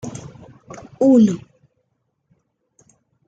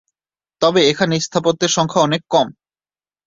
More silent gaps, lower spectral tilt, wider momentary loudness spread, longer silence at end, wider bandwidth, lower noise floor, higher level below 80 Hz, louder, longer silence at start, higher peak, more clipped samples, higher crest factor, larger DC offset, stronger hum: neither; first, -8 dB/octave vs -4 dB/octave; first, 27 LU vs 4 LU; first, 1.9 s vs 0.75 s; first, 9 kHz vs 7.8 kHz; second, -71 dBFS vs under -90 dBFS; about the same, -60 dBFS vs -56 dBFS; about the same, -16 LUFS vs -16 LUFS; second, 0.05 s vs 0.6 s; about the same, -4 dBFS vs -2 dBFS; neither; about the same, 18 dB vs 16 dB; neither; neither